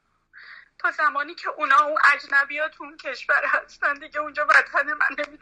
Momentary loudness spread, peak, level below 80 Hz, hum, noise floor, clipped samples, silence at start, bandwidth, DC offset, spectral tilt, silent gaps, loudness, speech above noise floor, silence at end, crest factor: 12 LU; -6 dBFS; -68 dBFS; none; -50 dBFS; under 0.1%; 0.5 s; 10.5 kHz; under 0.1%; -1 dB/octave; none; -21 LUFS; 27 dB; 0.05 s; 18 dB